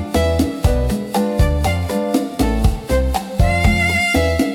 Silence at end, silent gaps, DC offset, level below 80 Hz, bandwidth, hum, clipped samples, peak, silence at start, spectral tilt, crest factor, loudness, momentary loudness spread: 0 s; none; under 0.1%; -22 dBFS; 17.5 kHz; none; under 0.1%; -2 dBFS; 0 s; -6 dB/octave; 14 dB; -17 LUFS; 5 LU